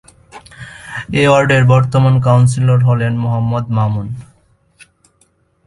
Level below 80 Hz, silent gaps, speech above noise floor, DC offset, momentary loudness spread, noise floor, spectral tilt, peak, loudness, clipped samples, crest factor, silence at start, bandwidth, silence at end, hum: -44 dBFS; none; 45 dB; under 0.1%; 18 LU; -57 dBFS; -7 dB/octave; 0 dBFS; -13 LUFS; under 0.1%; 14 dB; 0.35 s; 11 kHz; 1.45 s; none